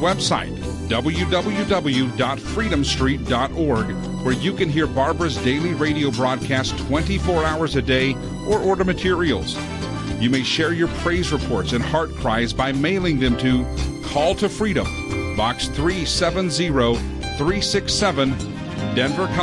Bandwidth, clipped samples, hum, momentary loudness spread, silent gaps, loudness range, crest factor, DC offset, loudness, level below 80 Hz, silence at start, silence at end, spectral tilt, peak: 11.5 kHz; under 0.1%; none; 5 LU; none; 1 LU; 14 dB; under 0.1%; -21 LUFS; -34 dBFS; 0 s; 0 s; -5 dB/octave; -6 dBFS